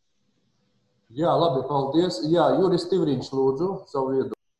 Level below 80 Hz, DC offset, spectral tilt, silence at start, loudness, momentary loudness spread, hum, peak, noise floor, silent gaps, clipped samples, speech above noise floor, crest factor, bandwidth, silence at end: -60 dBFS; under 0.1%; -7 dB/octave; 1.1 s; -23 LUFS; 7 LU; none; -8 dBFS; -72 dBFS; none; under 0.1%; 49 dB; 16 dB; 10.5 kHz; 0.25 s